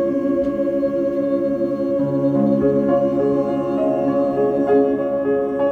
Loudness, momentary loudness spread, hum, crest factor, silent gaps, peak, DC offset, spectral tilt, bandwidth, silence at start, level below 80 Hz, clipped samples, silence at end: -19 LUFS; 4 LU; none; 12 dB; none; -6 dBFS; under 0.1%; -9.5 dB/octave; 4.5 kHz; 0 s; -50 dBFS; under 0.1%; 0 s